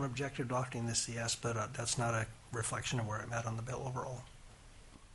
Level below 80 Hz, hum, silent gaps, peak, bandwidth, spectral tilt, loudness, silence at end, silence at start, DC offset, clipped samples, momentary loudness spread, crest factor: -60 dBFS; none; none; -20 dBFS; 11.5 kHz; -4 dB/octave; -38 LUFS; 0 s; 0 s; under 0.1%; under 0.1%; 7 LU; 18 dB